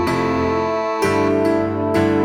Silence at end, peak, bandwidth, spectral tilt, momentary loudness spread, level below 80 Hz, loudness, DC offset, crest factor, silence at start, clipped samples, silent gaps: 0 s; -6 dBFS; 17 kHz; -6.5 dB/octave; 3 LU; -44 dBFS; -18 LUFS; under 0.1%; 12 dB; 0 s; under 0.1%; none